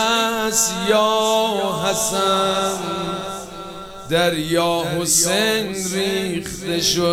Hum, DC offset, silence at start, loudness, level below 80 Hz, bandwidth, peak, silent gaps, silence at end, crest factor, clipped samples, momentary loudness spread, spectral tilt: none; under 0.1%; 0 s; -19 LUFS; -48 dBFS; over 20 kHz; -4 dBFS; none; 0 s; 16 dB; under 0.1%; 10 LU; -2.5 dB/octave